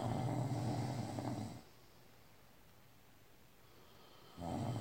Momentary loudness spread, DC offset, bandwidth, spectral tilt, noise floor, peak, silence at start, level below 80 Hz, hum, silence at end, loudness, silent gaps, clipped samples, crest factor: 25 LU; under 0.1%; 16.5 kHz; -7 dB/octave; -66 dBFS; -26 dBFS; 0 s; -70 dBFS; none; 0 s; -42 LUFS; none; under 0.1%; 18 dB